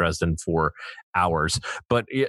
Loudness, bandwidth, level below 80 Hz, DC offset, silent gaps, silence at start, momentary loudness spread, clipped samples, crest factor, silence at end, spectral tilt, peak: -25 LUFS; 12.5 kHz; -42 dBFS; under 0.1%; 1.03-1.13 s; 0 s; 6 LU; under 0.1%; 16 dB; 0 s; -5 dB/octave; -8 dBFS